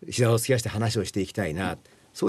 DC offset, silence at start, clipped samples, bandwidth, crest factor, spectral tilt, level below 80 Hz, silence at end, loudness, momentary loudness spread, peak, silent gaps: under 0.1%; 0 s; under 0.1%; 13 kHz; 16 dB; -5 dB/octave; -56 dBFS; 0 s; -26 LUFS; 11 LU; -10 dBFS; none